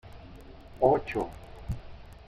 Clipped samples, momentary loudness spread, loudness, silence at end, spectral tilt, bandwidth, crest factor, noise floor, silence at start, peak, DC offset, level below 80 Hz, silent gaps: under 0.1%; 25 LU; -30 LUFS; 0.1 s; -8 dB/octave; 15.5 kHz; 22 dB; -48 dBFS; 0.05 s; -10 dBFS; under 0.1%; -46 dBFS; none